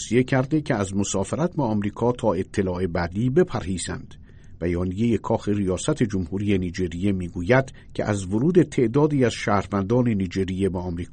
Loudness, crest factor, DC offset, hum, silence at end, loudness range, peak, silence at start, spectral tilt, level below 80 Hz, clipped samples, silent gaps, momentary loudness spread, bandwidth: -23 LUFS; 18 dB; under 0.1%; none; 0 s; 3 LU; -6 dBFS; 0 s; -6.5 dB/octave; -44 dBFS; under 0.1%; none; 7 LU; 9.4 kHz